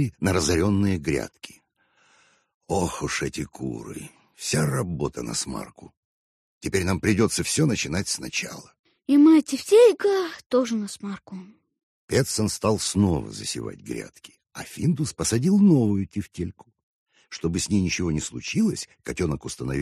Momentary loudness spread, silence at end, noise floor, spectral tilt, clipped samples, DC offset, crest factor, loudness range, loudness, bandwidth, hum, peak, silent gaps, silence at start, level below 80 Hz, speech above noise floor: 19 LU; 0 s; -65 dBFS; -5 dB/octave; under 0.1%; under 0.1%; 18 dB; 8 LU; -23 LUFS; 13 kHz; none; -6 dBFS; 2.54-2.61 s, 5.97-6.61 s, 8.79-8.84 s, 10.46-10.50 s, 11.83-12.08 s, 16.83-17.06 s; 0 s; -48 dBFS; 41 dB